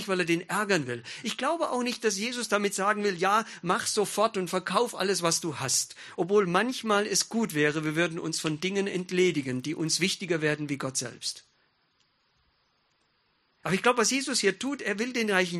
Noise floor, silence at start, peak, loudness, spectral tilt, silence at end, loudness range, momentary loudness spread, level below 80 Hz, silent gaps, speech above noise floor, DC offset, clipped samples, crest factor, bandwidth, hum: -71 dBFS; 0 s; -6 dBFS; -27 LUFS; -3.5 dB/octave; 0 s; 5 LU; 7 LU; -72 dBFS; none; 43 dB; under 0.1%; under 0.1%; 22 dB; 13 kHz; none